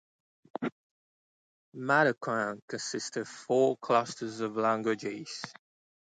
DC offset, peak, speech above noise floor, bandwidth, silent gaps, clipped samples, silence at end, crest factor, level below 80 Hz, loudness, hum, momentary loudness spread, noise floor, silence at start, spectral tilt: under 0.1%; -12 dBFS; over 60 dB; 9.4 kHz; 0.72-1.72 s, 2.62-2.68 s; under 0.1%; 0.5 s; 20 dB; -80 dBFS; -31 LUFS; none; 14 LU; under -90 dBFS; 0.6 s; -4.5 dB/octave